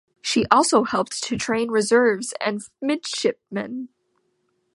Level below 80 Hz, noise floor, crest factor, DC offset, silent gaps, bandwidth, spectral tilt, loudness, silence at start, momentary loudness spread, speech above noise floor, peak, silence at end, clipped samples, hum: -58 dBFS; -70 dBFS; 22 dB; under 0.1%; none; 11.5 kHz; -3.5 dB/octave; -22 LUFS; 0.25 s; 13 LU; 48 dB; 0 dBFS; 0.9 s; under 0.1%; none